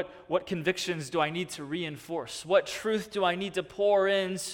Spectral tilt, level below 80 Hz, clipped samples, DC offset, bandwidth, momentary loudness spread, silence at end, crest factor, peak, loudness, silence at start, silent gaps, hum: -4 dB/octave; -66 dBFS; under 0.1%; under 0.1%; 17.5 kHz; 10 LU; 0 s; 18 dB; -10 dBFS; -29 LUFS; 0 s; none; none